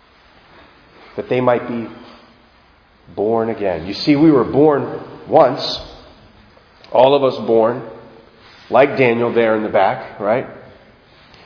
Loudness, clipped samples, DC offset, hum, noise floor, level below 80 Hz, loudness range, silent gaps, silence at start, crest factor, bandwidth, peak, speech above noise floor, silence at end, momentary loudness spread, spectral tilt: -16 LUFS; under 0.1%; under 0.1%; none; -51 dBFS; -52 dBFS; 6 LU; none; 1.15 s; 18 dB; 5.4 kHz; 0 dBFS; 36 dB; 0.85 s; 17 LU; -7.5 dB/octave